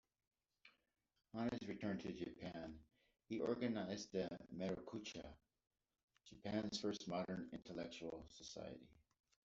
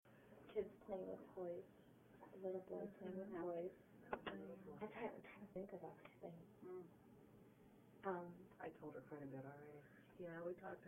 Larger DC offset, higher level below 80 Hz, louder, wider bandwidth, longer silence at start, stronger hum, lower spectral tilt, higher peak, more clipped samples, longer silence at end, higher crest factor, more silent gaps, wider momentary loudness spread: neither; first, -74 dBFS vs -82 dBFS; first, -48 LUFS vs -53 LUFS; second, 8 kHz vs 16 kHz; first, 0.65 s vs 0.05 s; neither; second, -5 dB/octave vs -8 dB/octave; about the same, -28 dBFS vs -30 dBFS; neither; first, 0.45 s vs 0 s; about the same, 20 dB vs 24 dB; first, 6.03-6.08 s vs none; second, 12 LU vs 17 LU